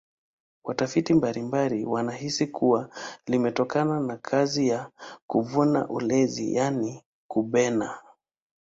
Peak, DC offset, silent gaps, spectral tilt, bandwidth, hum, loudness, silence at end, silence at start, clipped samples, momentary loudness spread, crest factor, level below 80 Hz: -8 dBFS; under 0.1%; 5.22-5.29 s, 7.06-7.29 s; -5.5 dB/octave; 7.8 kHz; none; -26 LUFS; 0.65 s; 0.65 s; under 0.1%; 11 LU; 18 dB; -64 dBFS